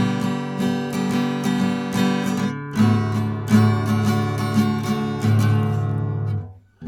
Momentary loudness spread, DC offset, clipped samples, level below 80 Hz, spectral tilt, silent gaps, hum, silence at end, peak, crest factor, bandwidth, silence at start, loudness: 6 LU; under 0.1%; under 0.1%; -50 dBFS; -7 dB/octave; none; none; 0 s; -2 dBFS; 18 dB; 14.5 kHz; 0 s; -21 LUFS